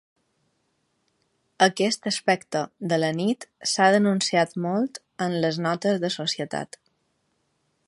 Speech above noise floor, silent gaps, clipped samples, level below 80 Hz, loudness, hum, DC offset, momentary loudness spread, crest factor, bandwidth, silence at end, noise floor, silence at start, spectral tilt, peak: 48 dB; none; under 0.1%; -72 dBFS; -24 LUFS; none; under 0.1%; 10 LU; 22 dB; 11.5 kHz; 1.2 s; -72 dBFS; 1.6 s; -4 dB/octave; -4 dBFS